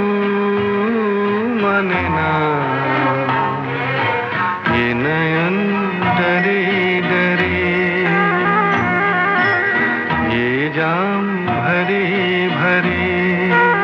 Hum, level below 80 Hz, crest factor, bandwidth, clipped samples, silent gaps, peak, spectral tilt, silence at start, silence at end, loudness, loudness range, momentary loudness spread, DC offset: none; -48 dBFS; 14 dB; 6.8 kHz; under 0.1%; none; -2 dBFS; -8 dB/octave; 0 s; 0 s; -16 LUFS; 2 LU; 3 LU; under 0.1%